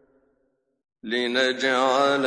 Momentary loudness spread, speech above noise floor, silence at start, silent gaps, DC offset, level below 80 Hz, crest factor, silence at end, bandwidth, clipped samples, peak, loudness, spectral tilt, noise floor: 9 LU; 49 dB; 1.05 s; none; under 0.1%; -76 dBFS; 16 dB; 0 s; 10.5 kHz; under 0.1%; -8 dBFS; -22 LUFS; -3 dB/octave; -71 dBFS